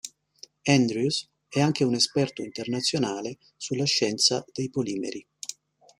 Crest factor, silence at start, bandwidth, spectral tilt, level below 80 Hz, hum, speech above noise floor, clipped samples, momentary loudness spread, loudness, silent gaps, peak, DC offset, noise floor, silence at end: 22 dB; 0.05 s; 14.5 kHz; -4 dB/octave; -66 dBFS; none; 27 dB; under 0.1%; 15 LU; -25 LUFS; none; -4 dBFS; under 0.1%; -53 dBFS; 0.45 s